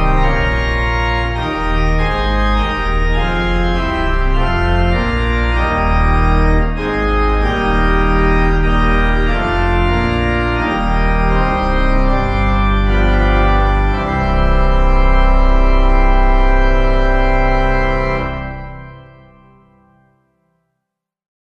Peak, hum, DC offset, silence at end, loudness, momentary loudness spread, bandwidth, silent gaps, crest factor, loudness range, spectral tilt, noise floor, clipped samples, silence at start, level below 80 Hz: -2 dBFS; none; under 0.1%; 2.55 s; -15 LUFS; 3 LU; 6.4 kHz; none; 12 dB; 3 LU; -7.5 dB/octave; -77 dBFS; under 0.1%; 0 s; -14 dBFS